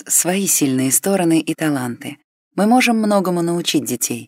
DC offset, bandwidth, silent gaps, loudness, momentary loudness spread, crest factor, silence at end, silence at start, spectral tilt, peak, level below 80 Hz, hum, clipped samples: under 0.1%; 16.5 kHz; 2.24-2.51 s; -16 LUFS; 10 LU; 16 dB; 0 s; 0.05 s; -3.5 dB/octave; -2 dBFS; -68 dBFS; none; under 0.1%